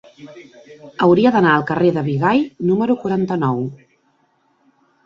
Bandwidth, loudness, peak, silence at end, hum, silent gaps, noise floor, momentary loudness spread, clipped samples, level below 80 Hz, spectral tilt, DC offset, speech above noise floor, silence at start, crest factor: 7.2 kHz; -17 LUFS; -2 dBFS; 1.3 s; none; none; -61 dBFS; 8 LU; under 0.1%; -58 dBFS; -8.5 dB/octave; under 0.1%; 44 dB; 0.2 s; 16 dB